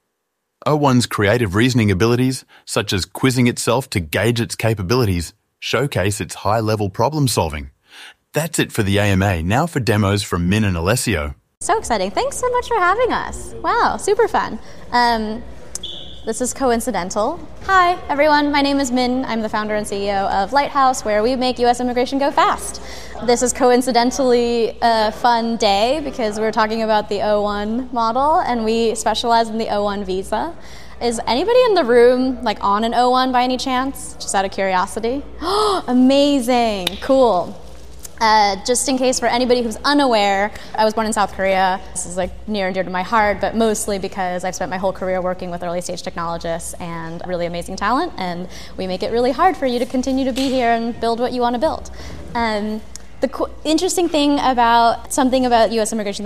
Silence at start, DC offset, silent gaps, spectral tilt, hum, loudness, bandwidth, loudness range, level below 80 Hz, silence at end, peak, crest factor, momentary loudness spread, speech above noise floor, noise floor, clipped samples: 0 s; 2%; 11.57-11.61 s; -4.5 dB/octave; none; -18 LUFS; 15.5 kHz; 4 LU; -40 dBFS; 0 s; -2 dBFS; 16 dB; 10 LU; 56 dB; -74 dBFS; under 0.1%